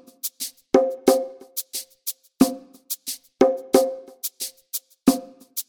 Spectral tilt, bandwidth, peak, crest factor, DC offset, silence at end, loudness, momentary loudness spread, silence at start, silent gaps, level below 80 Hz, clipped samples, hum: -3.5 dB/octave; over 20 kHz; -2 dBFS; 22 dB; under 0.1%; 0.05 s; -24 LUFS; 12 LU; 0.25 s; none; -60 dBFS; under 0.1%; none